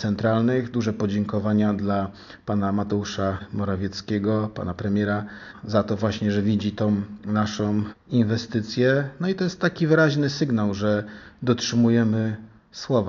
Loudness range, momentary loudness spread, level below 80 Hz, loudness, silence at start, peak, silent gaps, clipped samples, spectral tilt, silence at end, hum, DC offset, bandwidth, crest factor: 4 LU; 9 LU; -56 dBFS; -24 LUFS; 0 s; -4 dBFS; none; under 0.1%; -6 dB/octave; 0 s; none; under 0.1%; 7.2 kHz; 18 dB